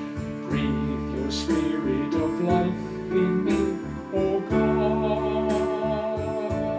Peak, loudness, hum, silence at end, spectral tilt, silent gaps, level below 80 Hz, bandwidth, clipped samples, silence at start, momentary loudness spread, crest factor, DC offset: -10 dBFS; -25 LUFS; none; 0 s; -7 dB/octave; none; -42 dBFS; 8 kHz; under 0.1%; 0 s; 6 LU; 16 dB; under 0.1%